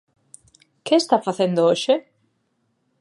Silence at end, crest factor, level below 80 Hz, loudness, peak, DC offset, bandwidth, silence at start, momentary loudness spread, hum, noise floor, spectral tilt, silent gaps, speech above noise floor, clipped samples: 1 s; 20 dB; -74 dBFS; -20 LUFS; -2 dBFS; under 0.1%; 11.5 kHz; 0.85 s; 5 LU; none; -70 dBFS; -5 dB/octave; none; 51 dB; under 0.1%